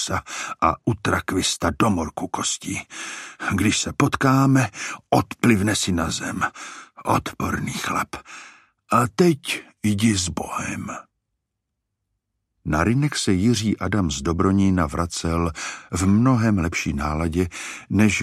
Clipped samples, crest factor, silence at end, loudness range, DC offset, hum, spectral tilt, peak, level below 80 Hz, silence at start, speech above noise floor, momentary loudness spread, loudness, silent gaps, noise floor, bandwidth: under 0.1%; 18 dB; 0 s; 5 LU; under 0.1%; none; -5 dB/octave; -4 dBFS; -42 dBFS; 0 s; 58 dB; 12 LU; -22 LUFS; none; -80 dBFS; 15 kHz